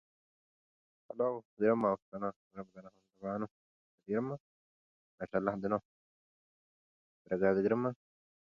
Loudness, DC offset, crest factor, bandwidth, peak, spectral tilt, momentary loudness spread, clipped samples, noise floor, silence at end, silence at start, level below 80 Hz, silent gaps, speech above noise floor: -35 LUFS; under 0.1%; 22 dB; 7 kHz; -16 dBFS; -8 dB/octave; 19 LU; under 0.1%; under -90 dBFS; 0.5 s; 1.1 s; -72 dBFS; 1.45-1.57 s, 2.02-2.12 s, 2.36-2.51 s, 3.51-3.98 s, 4.40-5.18 s, 5.85-7.25 s; over 56 dB